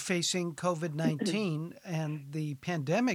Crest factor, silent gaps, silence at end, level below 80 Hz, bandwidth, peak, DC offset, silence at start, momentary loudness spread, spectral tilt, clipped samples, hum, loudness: 16 dB; none; 0 s; -74 dBFS; 15.5 kHz; -16 dBFS; under 0.1%; 0 s; 7 LU; -5 dB/octave; under 0.1%; none; -33 LUFS